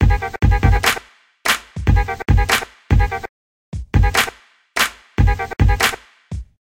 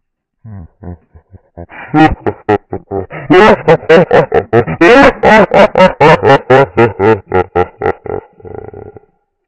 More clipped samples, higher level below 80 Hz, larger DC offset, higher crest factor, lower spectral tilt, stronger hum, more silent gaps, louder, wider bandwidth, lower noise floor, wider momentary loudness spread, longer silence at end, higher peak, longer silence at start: second, under 0.1% vs 0.7%; first, -20 dBFS vs -34 dBFS; neither; first, 16 dB vs 10 dB; second, -4.5 dB/octave vs -7 dB/octave; neither; first, 3.29-3.72 s vs none; second, -18 LUFS vs -8 LUFS; first, 16.5 kHz vs 9.4 kHz; second, -37 dBFS vs -48 dBFS; about the same, 17 LU vs 16 LU; second, 0.25 s vs 0.6 s; about the same, -2 dBFS vs 0 dBFS; second, 0 s vs 0.45 s